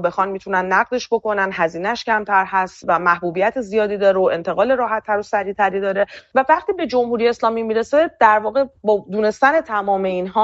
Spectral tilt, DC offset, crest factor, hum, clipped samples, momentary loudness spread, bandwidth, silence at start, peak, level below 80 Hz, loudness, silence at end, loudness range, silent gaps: -3 dB/octave; under 0.1%; 16 dB; none; under 0.1%; 5 LU; 8 kHz; 0 s; -2 dBFS; -56 dBFS; -18 LUFS; 0 s; 1 LU; none